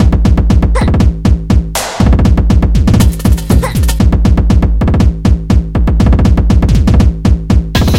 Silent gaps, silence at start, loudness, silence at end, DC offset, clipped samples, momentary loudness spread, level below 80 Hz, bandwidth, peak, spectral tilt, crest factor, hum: none; 0 s; -10 LUFS; 0 s; 0.9%; 1%; 4 LU; -10 dBFS; 15.5 kHz; 0 dBFS; -7 dB/octave; 8 dB; none